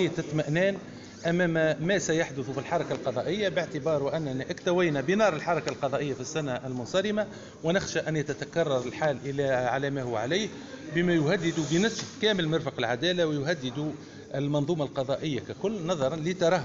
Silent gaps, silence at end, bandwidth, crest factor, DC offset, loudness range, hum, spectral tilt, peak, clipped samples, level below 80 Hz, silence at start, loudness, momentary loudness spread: none; 0 s; 7.8 kHz; 16 dB; under 0.1%; 2 LU; none; -4.5 dB/octave; -12 dBFS; under 0.1%; -60 dBFS; 0 s; -28 LUFS; 8 LU